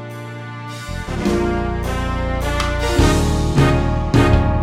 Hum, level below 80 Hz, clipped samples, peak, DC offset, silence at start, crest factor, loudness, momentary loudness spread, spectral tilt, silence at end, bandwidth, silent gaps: none; -24 dBFS; under 0.1%; -2 dBFS; under 0.1%; 0 s; 16 dB; -18 LUFS; 15 LU; -6 dB/octave; 0 s; 15.5 kHz; none